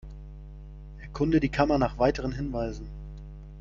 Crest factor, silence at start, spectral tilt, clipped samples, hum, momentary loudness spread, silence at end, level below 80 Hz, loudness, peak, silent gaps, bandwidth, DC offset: 20 dB; 0.05 s; -7.5 dB/octave; under 0.1%; none; 22 LU; 0 s; -40 dBFS; -27 LUFS; -8 dBFS; none; 7.4 kHz; under 0.1%